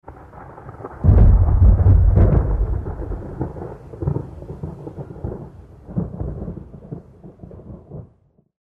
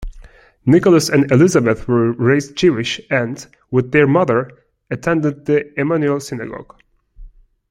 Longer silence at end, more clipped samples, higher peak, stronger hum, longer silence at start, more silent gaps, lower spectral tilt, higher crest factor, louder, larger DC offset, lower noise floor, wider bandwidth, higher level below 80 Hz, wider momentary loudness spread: first, 0.6 s vs 0.45 s; neither; about the same, -4 dBFS vs -2 dBFS; neither; about the same, 0.1 s vs 0 s; neither; first, -12 dB/octave vs -6 dB/octave; about the same, 14 dB vs 16 dB; second, -19 LUFS vs -16 LUFS; neither; first, -57 dBFS vs -42 dBFS; second, 2.3 kHz vs 15.5 kHz; first, -22 dBFS vs -42 dBFS; first, 25 LU vs 15 LU